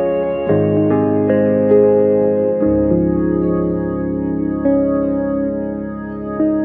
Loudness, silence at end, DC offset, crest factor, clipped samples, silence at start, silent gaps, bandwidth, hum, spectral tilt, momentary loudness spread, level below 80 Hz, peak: -16 LUFS; 0 s; under 0.1%; 14 dB; under 0.1%; 0 s; none; 3.1 kHz; none; -13 dB/octave; 8 LU; -38 dBFS; -2 dBFS